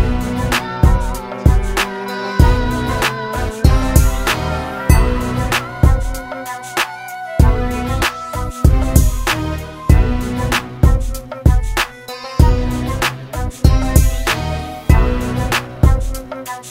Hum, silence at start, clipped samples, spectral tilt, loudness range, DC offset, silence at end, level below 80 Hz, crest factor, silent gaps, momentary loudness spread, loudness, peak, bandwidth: none; 0 s; under 0.1%; -5.5 dB/octave; 2 LU; under 0.1%; 0 s; -18 dBFS; 14 dB; none; 10 LU; -17 LUFS; 0 dBFS; 16.5 kHz